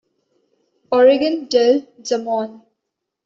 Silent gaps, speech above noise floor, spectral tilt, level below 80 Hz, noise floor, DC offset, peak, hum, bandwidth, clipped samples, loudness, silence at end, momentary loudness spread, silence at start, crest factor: none; 63 dB; -3.5 dB/octave; -66 dBFS; -79 dBFS; under 0.1%; -2 dBFS; none; 7.6 kHz; under 0.1%; -17 LUFS; 0.7 s; 10 LU; 0.9 s; 16 dB